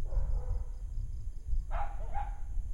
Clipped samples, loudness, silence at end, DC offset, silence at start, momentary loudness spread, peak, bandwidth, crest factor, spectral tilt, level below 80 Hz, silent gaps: under 0.1%; -41 LUFS; 0 s; under 0.1%; 0 s; 6 LU; -20 dBFS; 7 kHz; 12 dB; -7 dB/octave; -34 dBFS; none